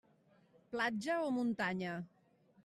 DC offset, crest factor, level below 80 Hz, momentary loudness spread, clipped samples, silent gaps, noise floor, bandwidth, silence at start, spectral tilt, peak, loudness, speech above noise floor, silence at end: under 0.1%; 16 dB; -80 dBFS; 11 LU; under 0.1%; none; -70 dBFS; 13 kHz; 0.7 s; -5.5 dB/octave; -24 dBFS; -38 LUFS; 33 dB; 0.6 s